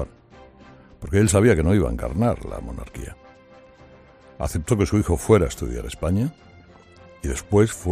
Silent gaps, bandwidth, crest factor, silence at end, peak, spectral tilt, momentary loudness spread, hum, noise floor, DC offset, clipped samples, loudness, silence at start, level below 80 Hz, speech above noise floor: none; 15 kHz; 18 dB; 0 s; -4 dBFS; -6.5 dB/octave; 18 LU; none; -49 dBFS; under 0.1%; under 0.1%; -21 LUFS; 0 s; -36 dBFS; 28 dB